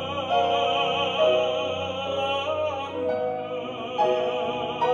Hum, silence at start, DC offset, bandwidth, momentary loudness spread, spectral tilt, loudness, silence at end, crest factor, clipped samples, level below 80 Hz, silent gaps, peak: none; 0 s; under 0.1%; 7.6 kHz; 7 LU; -4.5 dB/octave; -25 LUFS; 0 s; 14 dB; under 0.1%; -64 dBFS; none; -10 dBFS